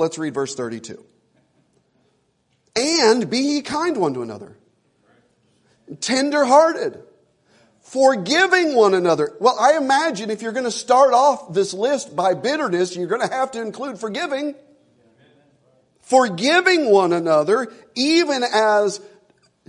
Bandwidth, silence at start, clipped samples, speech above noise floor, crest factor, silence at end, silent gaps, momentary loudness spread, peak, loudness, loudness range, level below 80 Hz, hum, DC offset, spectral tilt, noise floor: 11 kHz; 0 s; under 0.1%; 48 dB; 18 dB; 0.65 s; none; 13 LU; -2 dBFS; -18 LUFS; 7 LU; -70 dBFS; none; under 0.1%; -3.5 dB/octave; -66 dBFS